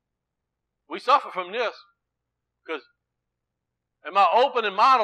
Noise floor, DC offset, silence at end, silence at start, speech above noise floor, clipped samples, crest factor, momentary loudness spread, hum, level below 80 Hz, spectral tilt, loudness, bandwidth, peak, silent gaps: -83 dBFS; under 0.1%; 0 s; 0.9 s; 61 dB; under 0.1%; 18 dB; 17 LU; none; -86 dBFS; -3 dB/octave; -22 LUFS; 10 kHz; -8 dBFS; none